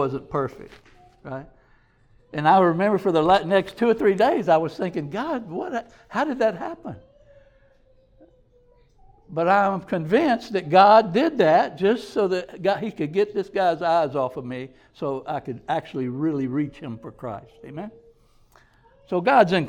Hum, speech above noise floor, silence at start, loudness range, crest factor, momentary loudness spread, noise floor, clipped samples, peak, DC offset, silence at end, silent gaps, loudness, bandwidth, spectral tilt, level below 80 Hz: none; 36 dB; 0 s; 11 LU; 20 dB; 18 LU; -58 dBFS; under 0.1%; -2 dBFS; under 0.1%; 0 s; none; -22 LUFS; 12.5 kHz; -7 dB/octave; -58 dBFS